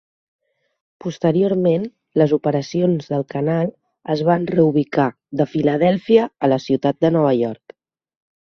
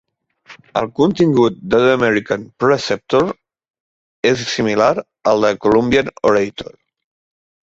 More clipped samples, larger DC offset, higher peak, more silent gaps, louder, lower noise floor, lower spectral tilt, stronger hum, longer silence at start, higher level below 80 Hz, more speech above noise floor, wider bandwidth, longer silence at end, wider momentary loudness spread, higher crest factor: neither; neither; about the same, -2 dBFS vs -2 dBFS; second, none vs 3.70-3.74 s, 3.80-4.23 s; about the same, -18 LUFS vs -16 LUFS; about the same, -47 dBFS vs -45 dBFS; first, -8 dB/octave vs -5.5 dB/octave; neither; first, 1.05 s vs 0.5 s; second, -60 dBFS vs -48 dBFS; about the same, 30 dB vs 30 dB; second, 6.8 kHz vs 8 kHz; about the same, 0.9 s vs 1 s; about the same, 8 LU vs 9 LU; about the same, 18 dB vs 16 dB